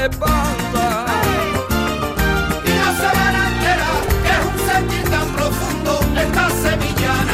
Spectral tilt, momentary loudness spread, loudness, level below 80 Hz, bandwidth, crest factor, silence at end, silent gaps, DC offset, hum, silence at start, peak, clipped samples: -4.5 dB/octave; 4 LU; -17 LUFS; -26 dBFS; 16 kHz; 10 dB; 0 s; none; under 0.1%; none; 0 s; -6 dBFS; under 0.1%